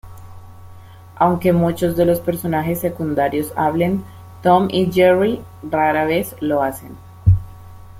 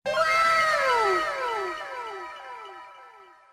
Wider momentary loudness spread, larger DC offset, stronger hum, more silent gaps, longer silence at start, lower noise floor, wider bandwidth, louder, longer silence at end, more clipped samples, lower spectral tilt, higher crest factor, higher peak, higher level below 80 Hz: second, 9 LU vs 20 LU; neither; neither; neither; about the same, 0.05 s vs 0.05 s; second, -39 dBFS vs -51 dBFS; about the same, 16.5 kHz vs 16 kHz; first, -18 LUFS vs -24 LUFS; second, 0 s vs 0.3 s; neither; first, -7 dB/octave vs -2 dB/octave; about the same, 16 dB vs 16 dB; first, -2 dBFS vs -10 dBFS; first, -40 dBFS vs -62 dBFS